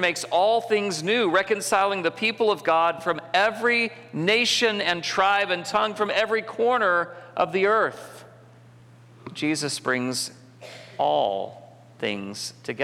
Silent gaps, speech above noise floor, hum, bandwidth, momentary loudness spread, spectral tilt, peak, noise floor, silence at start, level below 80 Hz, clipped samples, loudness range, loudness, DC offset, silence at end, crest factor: none; 26 dB; none; 16 kHz; 11 LU; -3 dB/octave; -8 dBFS; -50 dBFS; 0 s; -70 dBFS; under 0.1%; 6 LU; -23 LUFS; under 0.1%; 0 s; 16 dB